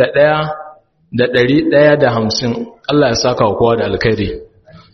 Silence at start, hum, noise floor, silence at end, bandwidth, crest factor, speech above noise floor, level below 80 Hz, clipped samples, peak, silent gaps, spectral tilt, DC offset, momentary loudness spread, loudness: 0 s; none; -39 dBFS; 0.15 s; 6.4 kHz; 14 dB; 27 dB; -40 dBFS; under 0.1%; 0 dBFS; none; -4.5 dB/octave; under 0.1%; 12 LU; -13 LUFS